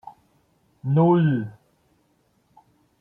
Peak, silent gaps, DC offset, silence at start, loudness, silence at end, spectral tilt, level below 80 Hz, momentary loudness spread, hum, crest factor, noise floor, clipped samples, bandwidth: -8 dBFS; none; under 0.1%; 0.05 s; -21 LUFS; 1.5 s; -11 dB/octave; -66 dBFS; 17 LU; none; 18 dB; -66 dBFS; under 0.1%; 3.6 kHz